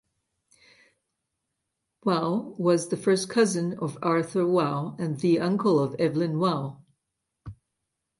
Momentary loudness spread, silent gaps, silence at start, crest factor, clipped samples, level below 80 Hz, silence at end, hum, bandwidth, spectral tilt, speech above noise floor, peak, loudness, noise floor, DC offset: 8 LU; none; 2.05 s; 16 dB; under 0.1%; -64 dBFS; 0.65 s; none; 11.5 kHz; -6 dB/octave; 57 dB; -10 dBFS; -25 LUFS; -82 dBFS; under 0.1%